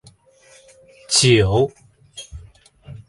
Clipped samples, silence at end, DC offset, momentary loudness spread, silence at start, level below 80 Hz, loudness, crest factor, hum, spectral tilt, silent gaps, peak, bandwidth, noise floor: under 0.1%; 0.05 s; under 0.1%; 25 LU; 1.1 s; -42 dBFS; -16 LUFS; 18 dB; none; -4 dB/octave; none; -2 dBFS; 11.5 kHz; -51 dBFS